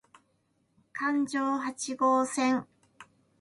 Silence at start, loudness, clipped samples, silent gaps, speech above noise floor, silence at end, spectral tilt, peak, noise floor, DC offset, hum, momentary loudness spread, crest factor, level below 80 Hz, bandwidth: 0.95 s; -29 LUFS; under 0.1%; none; 44 dB; 0.4 s; -3 dB/octave; -14 dBFS; -73 dBFS; under 0.1%; none; 8 LU; 18 dB; -76 dBFS; 11.5 kHz